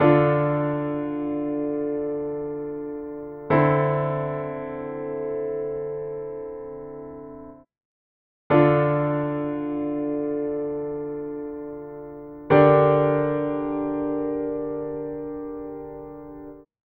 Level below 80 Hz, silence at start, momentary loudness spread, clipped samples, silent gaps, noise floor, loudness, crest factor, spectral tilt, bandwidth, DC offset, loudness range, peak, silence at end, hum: -54 dBFS; 0 s; 19 LU; under 0.1%; 7.85-8.50 s; under -90 dBFS; -24 LUFS; 22 dB; -12 dB/octave; 4.5 kHz; under 0.1%; 9 LU; -2 dBFS; 0.3 s; none